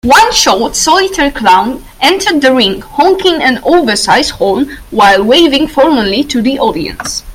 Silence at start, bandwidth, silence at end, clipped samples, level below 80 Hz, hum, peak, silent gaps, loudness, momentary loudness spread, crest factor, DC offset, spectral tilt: 0.05 s; 18 kHz; 0 s; 0.6%; -34 dBFS; none; 0 dBFS; none; -9 LUFS; 6 LU; 10 dB; under 0.1%; -2.5 dB/octave